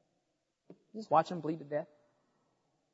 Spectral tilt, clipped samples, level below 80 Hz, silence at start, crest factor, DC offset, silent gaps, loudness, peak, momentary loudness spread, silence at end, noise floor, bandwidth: -5.5 dB/octave; under 0.1%; -86 dBFS; 0.7 s; 24 dB; under 0.1%; none; -34 LUFS; -14 dBFS; 19 LU; 1.1 s; -82 dBFS; 7.6 kHz